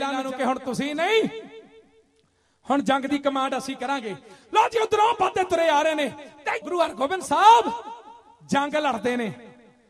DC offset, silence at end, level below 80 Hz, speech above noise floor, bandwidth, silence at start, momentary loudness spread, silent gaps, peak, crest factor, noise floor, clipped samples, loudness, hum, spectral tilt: under 0.1%; 0.4 s; -64 dBFS; 42 dB; 13.5 kHz; 0 s; 14 LU; none; -4 dBFS; 20 dB; -65 dBFS; under 0.1%; -23 LUFS; none; -4 dB/octave